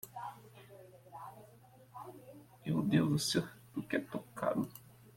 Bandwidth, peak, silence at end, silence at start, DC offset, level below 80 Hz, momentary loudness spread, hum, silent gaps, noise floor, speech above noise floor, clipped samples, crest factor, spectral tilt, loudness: 16.5 kHz; -16 dBFS; 0.05 s; 0.05 s; under 0.1%; -70 dBFS; 25 LU; none; none; -60 dBFS; 26 dB; under 0.1%; 22 dB; -5.5 dB/octave; -36 LUFS